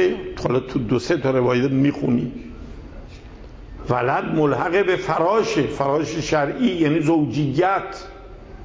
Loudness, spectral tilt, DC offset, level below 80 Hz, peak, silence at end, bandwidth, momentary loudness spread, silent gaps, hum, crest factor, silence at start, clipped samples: -20 LUFS; -6.5 dB/octave; under 0.1%; -42 dBFS; -6 dBFS; 0 s; 8 kHz; 21 LU; none; none; 14 dB; 0 s; under 0.1%